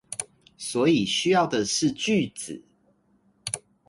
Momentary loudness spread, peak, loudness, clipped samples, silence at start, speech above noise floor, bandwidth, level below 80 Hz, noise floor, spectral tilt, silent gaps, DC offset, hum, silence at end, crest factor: 16 LU; -8 dBFS; -24 LUFS; under 0.1%; 0.1 s; 41 dB; 11.5 kHz; -62 dBFS; -65 dBFS; -4 dB/octave; none; under 0.1%; none; 0.3 s; 18 dB